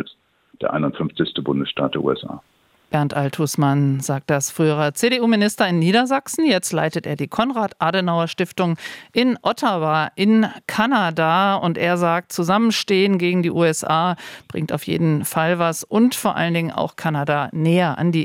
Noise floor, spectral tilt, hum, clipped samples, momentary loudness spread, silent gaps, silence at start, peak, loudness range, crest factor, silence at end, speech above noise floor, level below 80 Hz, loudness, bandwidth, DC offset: -53 dBFS; -5 dB/octave; none; under 0.1%; 7 LU; none; 0 s; -4 dBFS; 3 LU; 16 dB; 0 s; 34 dB; -62 dBFS; -19 LUFS; 17 kHz; under 0.1%